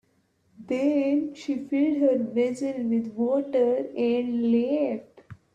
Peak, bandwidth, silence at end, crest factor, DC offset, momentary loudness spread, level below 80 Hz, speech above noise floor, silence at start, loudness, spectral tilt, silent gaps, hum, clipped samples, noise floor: -12 dBFS; 9.6 kHz; 0.2 s; 14 dB; under 0.1%; 6 LU; -70 dBFS; 43 dB; 0.6 s; -25 LUFS; -7 dB/octave; none; none; under 0.1%; -68 dBFS